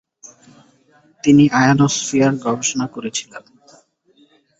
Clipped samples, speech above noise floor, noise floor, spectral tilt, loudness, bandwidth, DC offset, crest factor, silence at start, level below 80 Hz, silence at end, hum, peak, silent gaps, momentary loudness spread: under 0.1%; 40 dB; -56 dBFS; -4.5 dB/octave; -16 LUFS; 8.2 kHz; under 0.1%; 18 dB; 1.25 s; -54 dBFS; 1.2 s; none; -2 dBFS; none; 13 LU